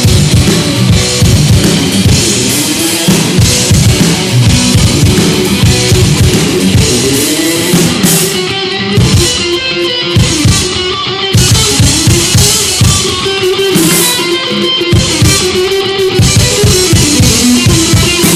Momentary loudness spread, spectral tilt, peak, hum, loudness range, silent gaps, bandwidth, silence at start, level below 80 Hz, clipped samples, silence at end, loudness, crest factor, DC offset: 4 LU; -4 dB/octave; 0 dBFS; none; 2 LU; none; 16 kHz; 0 s; -22 dBFS; 1%; 0 s; -7 LUFS; 8 dB; under 0.1%